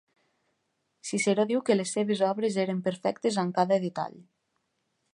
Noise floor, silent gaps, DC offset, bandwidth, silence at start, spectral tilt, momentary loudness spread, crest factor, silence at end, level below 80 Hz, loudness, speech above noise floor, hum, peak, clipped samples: -77 dBFS; none; under 0.1%; 11 kHz; 1.05 s; -5 dB/octave; 8 LU; 20 dB; 0.9 s; -78 dBFS; -28 LUFS; 50 dB; none; -10 dBFS; under 0.1%